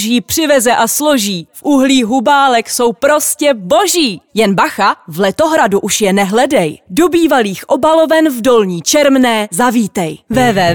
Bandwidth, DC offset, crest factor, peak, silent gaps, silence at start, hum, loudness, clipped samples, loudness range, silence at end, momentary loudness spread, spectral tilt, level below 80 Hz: over 20 kHz; 0.3%; 10 dB; -2 dBFS; none; 0 s; none; -11 LUFS; under 0.1%; 1 LU; 0 s; 5 LU; -3.5 dB/octave; -46 dBFS